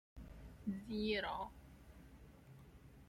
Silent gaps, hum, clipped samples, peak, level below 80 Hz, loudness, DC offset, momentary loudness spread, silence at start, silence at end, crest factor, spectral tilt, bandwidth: none; none; under 0.1%; -26 dBFS; -60 dBFS; -43 LUFS; under 0.1%; 22 LU; 0.15 s; 0 s; 20 dB; -6 dB/octave; 16 kHz